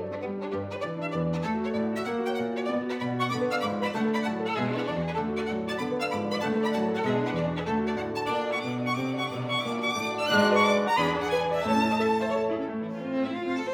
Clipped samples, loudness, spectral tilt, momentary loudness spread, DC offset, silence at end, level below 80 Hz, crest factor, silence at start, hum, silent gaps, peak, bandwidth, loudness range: under 0.1%; -28 LUFS; -5.5 dB/octave; 7 LU; under 0.1%; 0 s; -60 dBFS; 18 dB; 0 s; none; none; -10 dBFS; 18 kHz; 4 LU